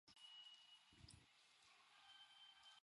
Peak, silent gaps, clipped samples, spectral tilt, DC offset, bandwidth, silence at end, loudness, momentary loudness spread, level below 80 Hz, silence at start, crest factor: -46 dBFS; none; under 0.1%; -1.5 dB/octave; under 0.1%; 11.5 kHz; 0 s; -65 LUFS; 8 LU; -84 dBFS; 0.05 s; 22 dB